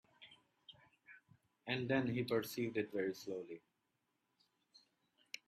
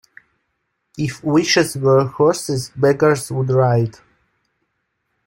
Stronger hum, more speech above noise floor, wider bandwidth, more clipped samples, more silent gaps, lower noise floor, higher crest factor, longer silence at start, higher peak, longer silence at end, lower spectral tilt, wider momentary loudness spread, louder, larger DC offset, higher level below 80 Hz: neither; second, 45 dB vs 56 dB; about the same, 15.5 kHz vs 16.5 kHz; neither; neither; first, -85 dBFS vs -72 dBFS; first, 22 dB vs 16 dB; second, 0.2 s vs 0.95 s; second, -24 dBFS vs -2 dBFS; second, 0.1 s vs 1.35 s; about the same, -5.5 dB/octave vs -5.5 dB/octave; first, 25 LU vs 9 LU; second, -40 LUFS vs -17 LUFS; neither; second, -80 dBFS vs -54 dBFS